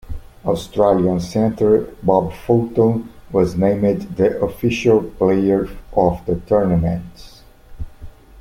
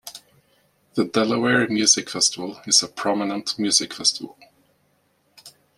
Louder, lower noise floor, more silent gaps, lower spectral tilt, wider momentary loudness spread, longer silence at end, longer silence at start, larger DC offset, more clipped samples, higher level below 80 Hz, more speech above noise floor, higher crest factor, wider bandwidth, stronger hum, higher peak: about the same, -18 LUFS vs -20 LUFS; second, -37 dBFS vs -65 dBFS; neither; first, -8 dB/octave vs -2 dB/octave; second, 11 LU vs 14 LU; second, 0 s vs 0.3 s; about the same, 0.05 s vs 0.05 s; neither; neither; first, -38 dBFS vs -66 dBFS; second, 20 dB vs 44 dB; second, 16 dB vs 22 dB; about the same, 16 kHz vs 15 kHz; neither; about the same, -2 dBFS vs -2 dBFS